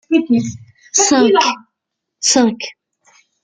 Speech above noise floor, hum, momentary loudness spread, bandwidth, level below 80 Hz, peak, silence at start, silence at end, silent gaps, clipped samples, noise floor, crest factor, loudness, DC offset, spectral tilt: 64 dB; none; 16 LU; 9.8 kHz; -60 dBFS; 0 dBFS; 0.1 s; 0.7 s; none; under 0.1%; -78 dBFS; 16 dB; -14 LUFS; under 0.1%; -2.5 dB/octave